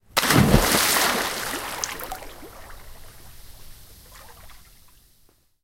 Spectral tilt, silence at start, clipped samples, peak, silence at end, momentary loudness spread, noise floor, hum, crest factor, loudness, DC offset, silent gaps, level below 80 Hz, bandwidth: -3.5 dB/octave; 0.15 s; under 0.1%; 0 dBFS; 1.05 s; 25 LU; -59 dBFS; none; 26 dB; -20 LUFS; under 0.1%; none; -38 dBFS; 17 kHz